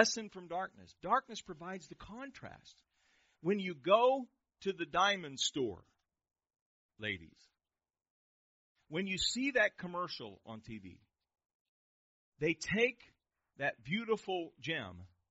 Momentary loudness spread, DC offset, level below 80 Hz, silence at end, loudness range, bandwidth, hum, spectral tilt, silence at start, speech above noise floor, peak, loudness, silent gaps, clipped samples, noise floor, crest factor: 18 LU; under 0.1%; -70 dBFS; 0.25 s; 8 LU; 7.6 kHz; none; -2 dB/octave; 0 s; over 53 dB; -12 dBFS; -36 LUFS; 6.61-6.89 s, 8.10-8.75 s, 11.55-12.32 s; under 0.1%; under -90 dBFS; 28 dB